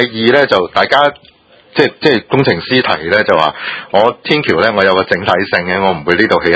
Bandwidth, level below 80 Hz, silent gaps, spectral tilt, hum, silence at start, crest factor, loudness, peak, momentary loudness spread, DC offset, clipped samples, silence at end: 8 kHz; -44 dBFS; none; -6 dB/octave; none; 0 s; 12 dB; -12 LUFS; 0 dBFS; 4 LU; under 0.1%; 0.4%; 0 s